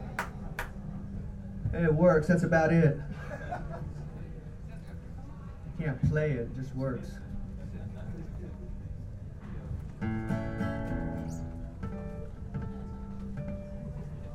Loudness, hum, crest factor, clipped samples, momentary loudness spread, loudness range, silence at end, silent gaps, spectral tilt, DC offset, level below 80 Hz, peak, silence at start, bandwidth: -33 LUFS; none; 20 dB; under 0.1%; 19 LU; 12 LU; 0 s; none; -8.5 dB/octave; under 0.1%; -44 dBFS; -12 dBFS; 0 s; 13 kHz